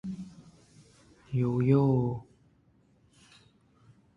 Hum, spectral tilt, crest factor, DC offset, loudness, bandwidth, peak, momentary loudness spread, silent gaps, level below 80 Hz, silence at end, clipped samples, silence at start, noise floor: none; -10 dB/octave; 20 dB; under 0.1%; -28 LUFS; 7.2 kHz; -12 dBFS; 18 LU; none; -60 dBFS; 1.95 s; under 0.1%; 0.05 s; -65 dBFS